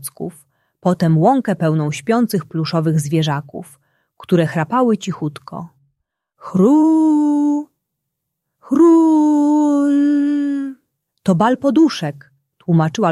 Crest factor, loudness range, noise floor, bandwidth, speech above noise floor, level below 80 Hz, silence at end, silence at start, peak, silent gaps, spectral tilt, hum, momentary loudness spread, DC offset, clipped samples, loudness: 14 dB; 5 LU; -77 dBFS; 13 kHz; 61 dB; -62 dBFS; 0 s; 0 s; -2 dBFS; none; -7 dB/octave; none; 15 LU; under 0.1%; under 0.1%; -16 LUFS